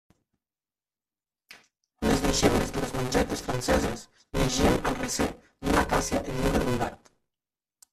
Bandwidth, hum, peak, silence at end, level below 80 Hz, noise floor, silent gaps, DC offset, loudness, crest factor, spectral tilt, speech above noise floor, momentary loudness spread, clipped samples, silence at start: 15.5 kHz; none; -8 dBFS; 1 s; -38 dBFS; under -90 dBFS; none; under 0.1%; -27 LUFS; 22 dB; -4.5 dB/octave; over 64 dB; 8 LU; under 0.1%; 1.5 s